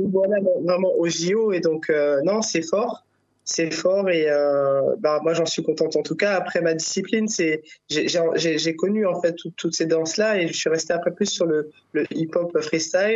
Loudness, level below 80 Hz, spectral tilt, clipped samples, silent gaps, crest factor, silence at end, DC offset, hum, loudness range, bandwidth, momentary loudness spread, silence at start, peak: -22 LUFS; -72 dBFS; -4 dB/octave; under 0.1%; none; 14 dB; 0 s; under 0.1%; none; 2 LU; 8 kHz; 5 LU; 0 s; -6 dBFS